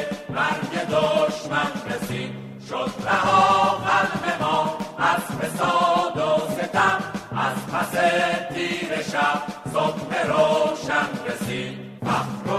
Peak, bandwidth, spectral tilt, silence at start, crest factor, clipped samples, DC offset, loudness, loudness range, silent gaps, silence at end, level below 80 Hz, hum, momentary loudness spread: -6 dBFS; 15 kHz; -4.5 dB/octave; 0 s; 16 dB; under 0.1%; under 0.1%; -22 LUFS; 3 LU; none; 0 s; -56 dBFS; none; 9 LU